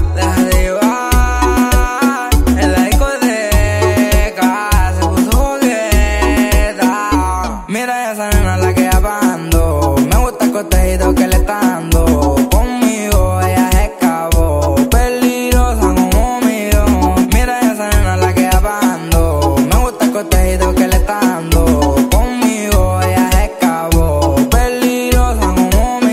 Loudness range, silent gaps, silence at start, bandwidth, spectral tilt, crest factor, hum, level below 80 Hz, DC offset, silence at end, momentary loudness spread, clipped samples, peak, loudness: 1 LU; none; 0 s; 16.5 kHz; -5.5 dB/octave; 12 dB; none; -16 dBFS; under 0.1%; 0 s; 3 LU; under 0.1%; 0 dBFS; -13 LUFS